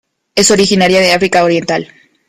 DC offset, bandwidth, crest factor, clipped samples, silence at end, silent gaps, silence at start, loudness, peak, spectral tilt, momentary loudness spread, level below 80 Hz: under 0.1%; 16 kHz; 12 dB; under 0.1%; 0.45 s; none; 0.35 s; -10 LUFS; 0 dBFS; -3.5 dB/octave; 9 LU; -46 dBFS